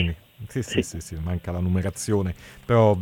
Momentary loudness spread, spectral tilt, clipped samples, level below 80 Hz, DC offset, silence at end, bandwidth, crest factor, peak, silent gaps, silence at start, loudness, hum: 12 LU; -6 dB/octave; under 0.1%; -42 dBFS; under 0.1%; 0 s; 18 kHz; 16 dB; -8 dBFS; none; 0 s; -26 LUFS; none